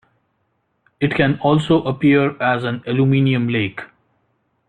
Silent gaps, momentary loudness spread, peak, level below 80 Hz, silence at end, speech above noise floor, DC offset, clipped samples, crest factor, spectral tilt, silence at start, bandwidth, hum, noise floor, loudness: none; 6 LU; -2 dBFS; -54 dBFS; 0.85 s; 51 dB; under 0.1%; under 0.1%; 16 dB; -8 dB/octave; 1 s; 9.4 kHz; none; -68 dBFS; -17 LUFS